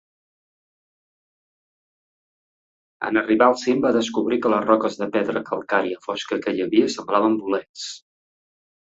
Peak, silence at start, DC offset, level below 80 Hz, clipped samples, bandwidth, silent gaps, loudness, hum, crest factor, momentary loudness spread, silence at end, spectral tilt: -2 dBFS; 3 s; under 0.1%; -66 dBFS; under 0.1%; 8 kHz; 7.69-7.74 s; -21 LUFS; none; 22 dB; 11 LU; 0.85 s; -4.5 dB/octave